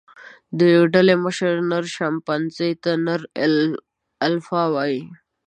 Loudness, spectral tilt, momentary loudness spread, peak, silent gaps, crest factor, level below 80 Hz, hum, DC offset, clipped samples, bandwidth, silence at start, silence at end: -20 LUFS; -6 dB/octave; 10 LU; -2 dBFS; none; 18 dB; -68 dBFS; none; under 0.1%; under 0.1%; 9.4 kHz; 0.2 s; 0.3 s